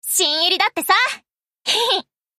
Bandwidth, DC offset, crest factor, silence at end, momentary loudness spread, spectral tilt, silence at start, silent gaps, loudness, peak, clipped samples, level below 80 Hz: 15.5 kHz; under 0.1%; 16 dB; 0.35 s; 7 LU; 1.5 dB/octave; 0.05 s; none; -17 LUFS; -4 dBFS; under 0.1%; -72 dBFS